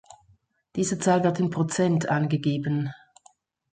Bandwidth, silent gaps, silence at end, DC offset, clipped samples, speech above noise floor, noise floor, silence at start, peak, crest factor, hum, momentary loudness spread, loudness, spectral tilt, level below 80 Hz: 9.4 kHz; none; 0.75 s; under 0.1%; under 0.1%; 39 dB; -63 dBFS; 0.1 s; -8 dBFS; 18 dB; none; 7 LU; -25 LUFS; -6 dB/octave; -64 dBFS